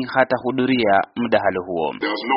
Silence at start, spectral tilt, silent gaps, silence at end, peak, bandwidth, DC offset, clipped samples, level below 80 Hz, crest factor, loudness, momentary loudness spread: 0 s; -3 dB/octave; none; 0 s; 0 dBFS; 5.6 kHz; under 0.1%; under 0.1%; -58 dBFS; 20 dB; -20 LUFS; 7 LU